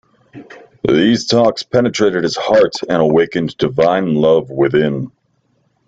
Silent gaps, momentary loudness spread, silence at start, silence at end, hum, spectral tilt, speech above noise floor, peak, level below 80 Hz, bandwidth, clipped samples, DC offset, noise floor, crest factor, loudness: none; 5 LU; 0.35 s; 0.8 s; none; -5.5 dB/octave; 48 dB; 0 dBFS; -50 dBFS; 8 kHz; under 0.1%; under 0.1%; -61 dBFS; 14 dB; -14 LUFS